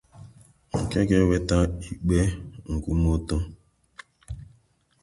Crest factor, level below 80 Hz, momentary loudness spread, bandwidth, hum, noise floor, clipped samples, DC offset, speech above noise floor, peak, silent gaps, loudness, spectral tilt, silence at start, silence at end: 18 dB; -34 dBFS; 19 LU; 11.5 kHz; none; -63 dBFS; under 0.1%; under 0.1%; 40 dB; -8 dBFS; none; -25 LUFS; -7 dB/octave; 0.15 s; 0.6 s